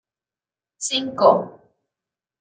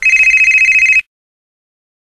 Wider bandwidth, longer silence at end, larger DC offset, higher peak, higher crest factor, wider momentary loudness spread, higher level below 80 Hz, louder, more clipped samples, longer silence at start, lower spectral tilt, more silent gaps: second, 9.6 kHz vs 13.5 kHz; second, 0.9 s vs 1.15 s; neither; about the same, -2 dBFS vs 0 dBFS; first, 22 dB vs 12 dB; first, 14 LU vs 4 LU; second, -70 dBFS vs -46 dBFS; second, -19 LUFS vs -6 LUFS; neither; first, 0.8 s vs 0 s; first, -3 dB/octave vs 2.5 dB/octave; neither